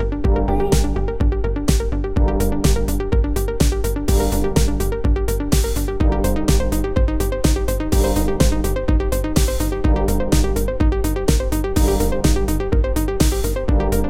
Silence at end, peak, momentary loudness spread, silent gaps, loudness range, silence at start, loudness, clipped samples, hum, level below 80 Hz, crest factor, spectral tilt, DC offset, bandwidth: 0 s; -2 dBFS; 3 LU; none; 1 LU; 0 s; -19 LUFS; under 0.1%; none; -20 dBFS; 14 dB; -6 dB/octave; under 0.1%; 16.5 kHz